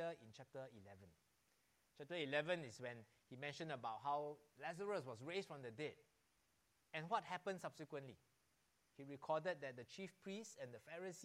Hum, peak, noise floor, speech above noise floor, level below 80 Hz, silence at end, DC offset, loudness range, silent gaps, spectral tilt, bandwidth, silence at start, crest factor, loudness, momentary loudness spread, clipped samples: none; -28 dBFS; -82 dBFS; 33 dB; under -90 dBFS; 0 s; under 0.1%; 4 LU; none; -4.5 dB/octave; 15.5 kHz; 0 s; 22 dB; -49 LUFS; 15 LU; under 0.1%